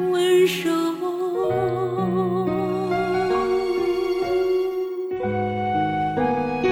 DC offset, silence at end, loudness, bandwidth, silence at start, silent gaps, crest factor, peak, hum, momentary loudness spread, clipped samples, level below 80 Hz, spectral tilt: under 0.1%; 0 s; -22 LUFS; 16 kHz; 0 s; none; 12 dB; -8 dBFS; none; 6 LU; under 0.1%; -50 dBFS; -6 dB/octave